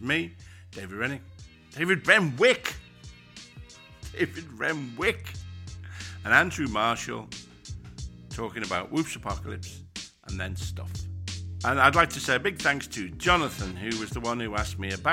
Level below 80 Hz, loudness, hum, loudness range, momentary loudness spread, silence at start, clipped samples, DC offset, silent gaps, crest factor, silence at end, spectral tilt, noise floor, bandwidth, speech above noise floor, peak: -46 dBFS; -27 LUFS; none; 8 LU; 21 LU; 0 s; under 0.1%; under 0.1%; none; 26 dB; 0 s; -4 dB/octave; -48 dBFS; 16.5 kHz; 21 dB; -2 dBFS